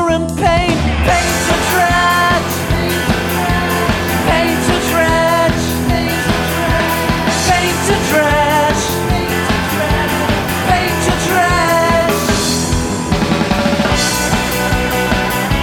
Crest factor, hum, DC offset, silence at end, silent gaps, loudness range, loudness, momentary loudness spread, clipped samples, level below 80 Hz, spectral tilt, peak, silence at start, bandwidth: 10 dB; none; under 0.1%; 0 s; none; 1 LU; -13 LUFS; 4 LU; under 0.1%; -26 dBFS; -4 dB/octave; -2 dBFS; 0 s; 18 kHz